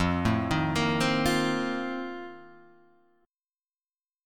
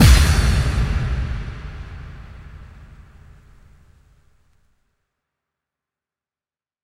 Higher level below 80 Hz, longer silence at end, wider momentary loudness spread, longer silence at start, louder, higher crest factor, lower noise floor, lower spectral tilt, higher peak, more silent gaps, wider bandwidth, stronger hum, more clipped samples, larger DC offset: second, -48 dBFS vs -24 dBFS; second, 0 s vs 4.2 s; second, 13 LU vs 26 LU; about the same, 0 s vs 0 s; second, -27 LUFS vs -19 LUFS; about the same, 18 dB vs 22 dB; about the same, under -90 dBFS vs under -90 dBFS; about the same, -5.5 dB/octave vs -5 dB/octave; second, -10 dBFS vs 0 dBFS; first, 4.15-4.19 s vs none; about the same, 17.5 kHz vs 16 kHz; neither; neither; neither